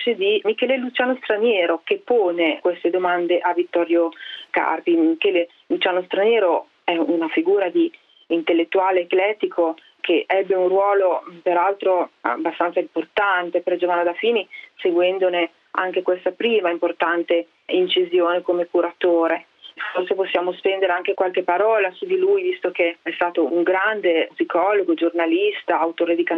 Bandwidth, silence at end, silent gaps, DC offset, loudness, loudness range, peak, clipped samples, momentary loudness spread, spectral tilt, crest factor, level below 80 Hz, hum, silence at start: 4.3 kHz; 0 s; none; under 0.1%; -20 LUFS; 1 LU; -4 dBFS; under 0.1%; 5 LU; -6.5 dB/octave; 16 dB; -74 dBFS; none; 0 s